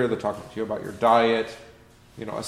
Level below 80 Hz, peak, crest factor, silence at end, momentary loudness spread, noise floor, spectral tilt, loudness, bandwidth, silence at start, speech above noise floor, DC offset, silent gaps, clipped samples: -58 dBFS; -6 dBFS; 20 dB; 0 s; 17 LU; -51 dBFS; -5 dB/octave; -24 LUFS; 15 kHz; 0 s; 27 dB; under 0.1%; none; under 0.1%